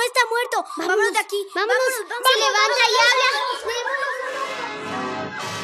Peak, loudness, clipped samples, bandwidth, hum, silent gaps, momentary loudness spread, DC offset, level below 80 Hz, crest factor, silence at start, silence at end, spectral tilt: -4 dBFS; -20 LUFS; under 0.1%; 15.5 kHz; none; none; 12 LU; under 0.1%; -74 dBFS; 16 dB; 0 s; 0 s; -1 dB/octave